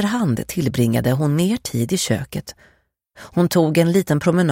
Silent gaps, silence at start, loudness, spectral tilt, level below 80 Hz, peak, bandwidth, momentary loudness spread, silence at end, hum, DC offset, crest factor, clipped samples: none; 0 s; -19 LUFS; -6 dB/octave; -48 dBFS; -4 dBFS; 16.5 kHz; 8 LU; 0 s; none; under 0.1%; 14 dB; under 0.1%